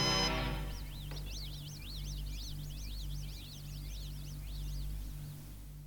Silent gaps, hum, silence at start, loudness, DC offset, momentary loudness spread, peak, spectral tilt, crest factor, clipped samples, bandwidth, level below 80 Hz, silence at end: none; 50 Hz at -45 dBFS; 0 s; -41 LUFS; under 0.1%; 10 LU; -20 dBFS; -3.5 dB/octave; 20 dB; under 0.1%; 19.5 kHz; -44 dBFS; 0 s